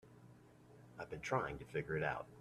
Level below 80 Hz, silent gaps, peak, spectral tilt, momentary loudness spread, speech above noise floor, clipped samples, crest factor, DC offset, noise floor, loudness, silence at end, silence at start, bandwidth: -66 dBFS; none; -22 dBFS; -6 dB/octave; 23 LU; 21 dB; under 0.1%; 22 dB; under 0.1%; -63 dBFS; -42 LUFS; 0 s; 0.05 s; 13.5 kHz